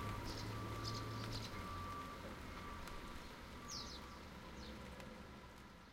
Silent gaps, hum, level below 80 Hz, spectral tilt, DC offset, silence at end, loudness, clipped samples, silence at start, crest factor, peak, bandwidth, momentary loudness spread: none; none; -58 dBFS; -4.5 dB/octave; under 0.1%; 0 s; -50 LUFS; under 0.1%; 0 s; 18 dB; -32 dBFS; 16 kHz; 9 LU